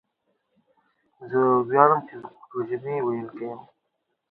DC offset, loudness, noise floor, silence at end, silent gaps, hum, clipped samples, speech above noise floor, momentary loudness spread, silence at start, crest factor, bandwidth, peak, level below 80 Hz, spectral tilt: under 0.1%; -23 LUFS; -77 dBFS; 0.7 s; none; none; under 0.1%; 54 dB; 20 LU; 1.2 s; 26 dB; 4.1 kHz; 0 dBFS; -72 dBFS; -11.5 dB/octave